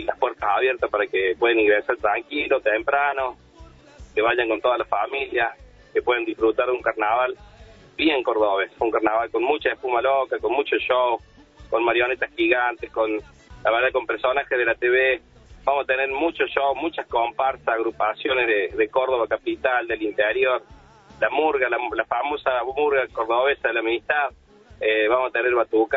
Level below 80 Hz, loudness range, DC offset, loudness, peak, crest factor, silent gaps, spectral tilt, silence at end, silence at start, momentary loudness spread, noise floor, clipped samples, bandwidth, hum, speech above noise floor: -54 dBFS; 1 LU; under 0.1%; -22 LUFS; -4 dBFS; 18 dB; none; -6 dB/octave; 0 s; 0 s; 5 LU; -47 dBFS; under 0.1%; 6.6 kHz; none; 25 dB